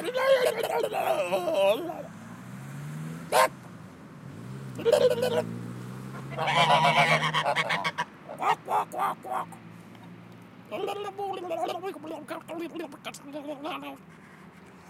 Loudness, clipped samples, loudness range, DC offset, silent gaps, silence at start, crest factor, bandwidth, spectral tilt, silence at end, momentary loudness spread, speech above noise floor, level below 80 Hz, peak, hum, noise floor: -27 LUFS; under 0.1%; 11 LU; under 0.1%; none; 0 s; 20 dB; 16 kHz; -4 dB/octave; 0 s; 22 LU; 12 dB; -70 dBFS; -10 dBFS; none; -50 dBFS